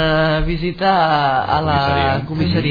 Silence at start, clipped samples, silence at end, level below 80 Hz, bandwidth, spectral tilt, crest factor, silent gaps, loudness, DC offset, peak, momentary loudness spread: 0 s; under 0.1%; 0 s; -30 dBFS; 5 kHz; -8 dB/octave; 14 dB; none; -16 LUFS; under 0.1%; -2 dBFS; 4 LU